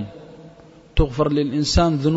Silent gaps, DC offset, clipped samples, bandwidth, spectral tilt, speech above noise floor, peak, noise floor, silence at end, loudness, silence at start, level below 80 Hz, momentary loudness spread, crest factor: none; under 0.1%; under 0.1%; 8 kHz; -6 dB/octave; 28 dB; -4 dBFS; -46 dBFS; 0 s; -20 LUFS; 0 s; -28 dBFS; 15 LU; 18 dB